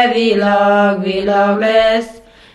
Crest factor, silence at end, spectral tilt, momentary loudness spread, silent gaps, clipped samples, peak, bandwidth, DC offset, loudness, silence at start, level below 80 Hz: 12 dB; 0.35 s; -6 dB/octave; 5 LU; none; under 0.1%; 0 dBFS; 11.5 kHz; under 0.1%; -13 LUFS; 0 s; -46 dBFS